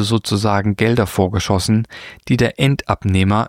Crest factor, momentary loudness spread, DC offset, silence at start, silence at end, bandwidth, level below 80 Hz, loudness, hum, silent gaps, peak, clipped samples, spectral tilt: 16 dB; 4 LU; under 0.1%; 0 s; 0 s; 16 kHz; -40 dBFS; -17 LUFS; none; none; -2 dBFS; under 0.1%; -6 dB/octave